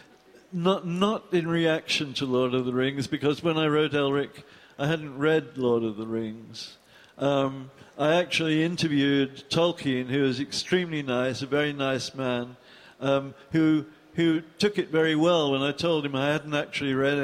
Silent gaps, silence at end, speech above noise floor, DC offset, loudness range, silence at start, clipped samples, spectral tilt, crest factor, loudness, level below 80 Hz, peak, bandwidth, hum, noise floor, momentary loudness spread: none; 0 s; 29 dB; under 0.1%; 3 LU; 0.5 s; under 0.1%; -5.5 dB/octave; 16 dB; -26 LUFS; -64 dBFS; -10 dBFS; 13.5 kHz; none; -55 dBFS; 8 LU